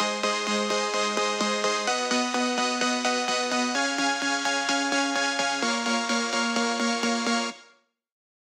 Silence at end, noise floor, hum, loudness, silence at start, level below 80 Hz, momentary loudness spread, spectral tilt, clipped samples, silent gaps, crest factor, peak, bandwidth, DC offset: 0.8 s; -61 dBFS; none; -25 LUFS; 0 s; -80 dBFS; 1 LU; -1.5 dB/octave; under 0.1%; none; 16 dB; -10 dBFS; 15.5 kHz; under 0.1%